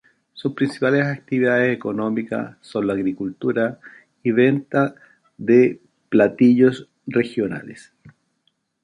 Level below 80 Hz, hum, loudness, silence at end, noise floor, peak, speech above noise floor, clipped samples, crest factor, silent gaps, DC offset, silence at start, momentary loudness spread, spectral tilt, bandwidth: -64 dBFS; none; -20 LUFS; 0.75 s; -69 dBFS; -2 dBFS; 50 dB; under 0.1%; 18 dB; none; under 0.1%; 0.35 s; 13 LU; -8 dB/octave; 10 kHz